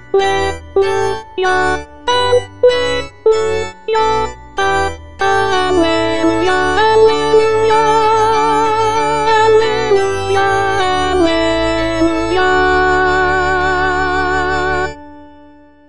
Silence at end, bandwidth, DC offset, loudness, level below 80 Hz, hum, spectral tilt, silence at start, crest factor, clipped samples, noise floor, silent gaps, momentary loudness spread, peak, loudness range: 0 s; 10.5 kHz; 4%; -13 LUFS; -34 dBFS; none; -4.5 dB/octave; 0 s; 14 dB; under 0.1%; -42 dBFS; none; 7 LU; 0 dBFS; 3 LU